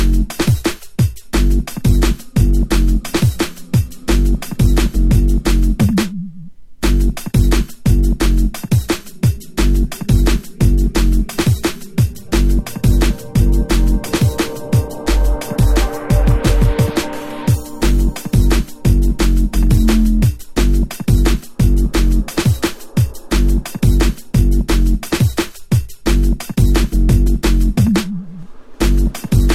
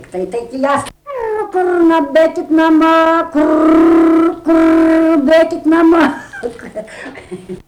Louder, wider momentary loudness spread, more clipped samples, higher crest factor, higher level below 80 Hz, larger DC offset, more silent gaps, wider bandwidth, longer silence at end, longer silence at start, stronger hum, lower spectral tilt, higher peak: second, -16 LUFS vs -11 LUFS; second, 4 LU vs 18 LU; neither; first, 14 dB vs 8 dB; first, -16 dBFS vs -44 dBFS; first, 2% vs under 0.1%; neither; first, 15.5 kHz vs 10.5 kHz; about the same, 0 s vs 0.1 s; second, 0 s vs 0.15 s; neither; about the same, -6 dB/octave vs -5.5 dB/octave; first, 0 dBFS vs -4 dBFS